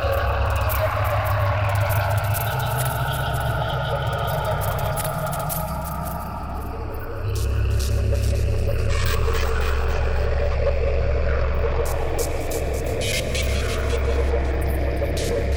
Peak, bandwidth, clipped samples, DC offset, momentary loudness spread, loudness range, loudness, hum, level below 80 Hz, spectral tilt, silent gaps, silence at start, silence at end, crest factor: -10 dBFS; 18.5 kHz; under 0.1%; under 0.1%; 4 LU; 3 LU; -24 LUFS; none; -26 dBFS; -5 dB/octave; none; 0 s; 0 s; 12 dB